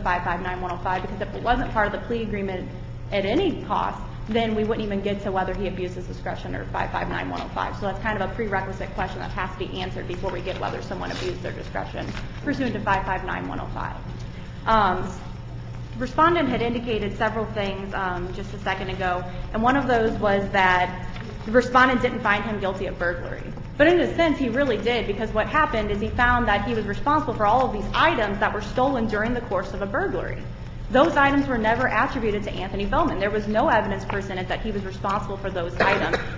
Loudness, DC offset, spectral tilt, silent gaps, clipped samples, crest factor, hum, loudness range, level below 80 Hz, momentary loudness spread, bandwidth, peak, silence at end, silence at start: -24 LUFS; under 0.1%; -6.5 dB/octave; none; under 0.1%; 20 dB; none; 7 LU; -36 dBFS; 12 LU; 7.8 kHz; -4 dBFS; 0 s; 0 s